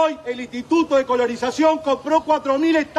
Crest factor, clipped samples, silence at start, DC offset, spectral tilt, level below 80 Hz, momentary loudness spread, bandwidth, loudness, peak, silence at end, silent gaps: 14 dB; under 0.1%; 0 s; under 0.1%; -4 dB/octave; -56 dBFS; 7 LU; 11.5 kHz; -20 LUFS; -4 dBFS; 0 s; none